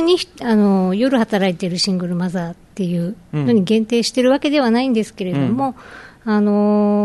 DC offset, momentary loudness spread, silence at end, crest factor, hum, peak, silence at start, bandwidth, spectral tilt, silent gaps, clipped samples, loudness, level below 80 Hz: under 0.1%; 9 LU; 0 s; 12 dB; none; -4 dBFS; 0 s; 12.5 kHz; -6 dB/octave; none; under 0.1%; -17 LUFS; -54 dBFS